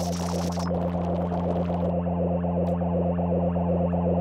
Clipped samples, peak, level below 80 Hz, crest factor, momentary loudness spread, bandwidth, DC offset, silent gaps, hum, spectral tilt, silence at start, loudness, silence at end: under 0.1%; -14 dBFS; -48 dBFS; 12 dB; 3 LU; 12 kHz; under 0.1%; none; none; -8 dB/octave; 0 s; -26 LUFS; 0 s